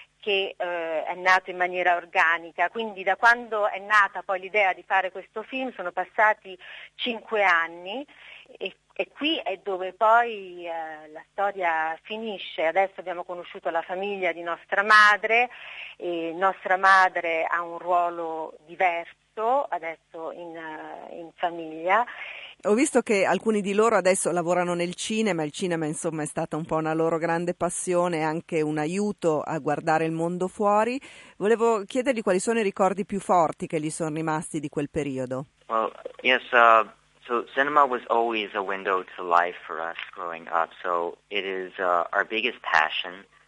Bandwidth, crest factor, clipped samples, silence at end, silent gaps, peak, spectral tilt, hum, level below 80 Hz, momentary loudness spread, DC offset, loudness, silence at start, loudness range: 11.5 kHz; 22 dB; under 0.1%; 0.25 s; none; -4 dBFS; -4 dB/octave; none; -68 dBFS; 14 LU; under 0.1%; -25 LUFS; 0 s; 5 LU